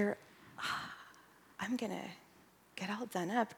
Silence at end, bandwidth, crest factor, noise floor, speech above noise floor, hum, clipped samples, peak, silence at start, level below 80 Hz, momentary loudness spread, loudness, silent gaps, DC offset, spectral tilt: 0 s; 19.5 kHz; 20 dB; -65 dBFS; 27 dB; none; under 0.1%; -20 dBFS; 0 s; -80 dBFS; 20 LU; -41 LUFS; none; under 0.1%; -4.5 dB/octave